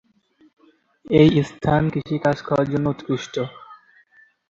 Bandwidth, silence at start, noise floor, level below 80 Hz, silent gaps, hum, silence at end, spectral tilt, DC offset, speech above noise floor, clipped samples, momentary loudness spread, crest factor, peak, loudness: 7.6 kHz; 1.05 s; -58 dBFS; -48 dBFS; none; none; 0.75 s; -7.5 dB/octave; under 0.1%; 39 dB; under 0.1%; 12 LU; 20 dB; -2 dBFS; -21 LUFS